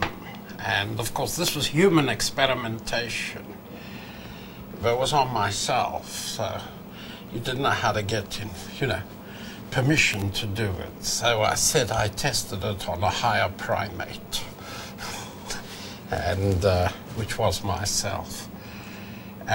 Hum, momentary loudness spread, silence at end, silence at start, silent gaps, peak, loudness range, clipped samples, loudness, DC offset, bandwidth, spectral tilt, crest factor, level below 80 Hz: none; 18 LU; 0 s; 0 s; none; -4 dBFS; 5 LU; under 0.1%; -25 LUFS; under 0.1%; 16.5 kHz; -3.5 dB/octave; 22 dB; -46 dBFS